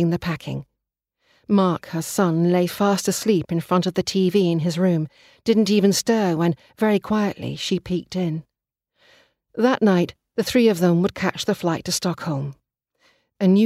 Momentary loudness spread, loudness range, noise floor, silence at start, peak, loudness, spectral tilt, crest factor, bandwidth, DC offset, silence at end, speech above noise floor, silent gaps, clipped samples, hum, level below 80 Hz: 9 LU; 4 LU; -81 dBFS; 0 s; -6 dBFS; -21 LUFS; -5.5 dB/octave; 16 dB; 15.5 kHz; under 0.1%; 0 s; 60 dB; none; under 0.1%; none; -56 dBFS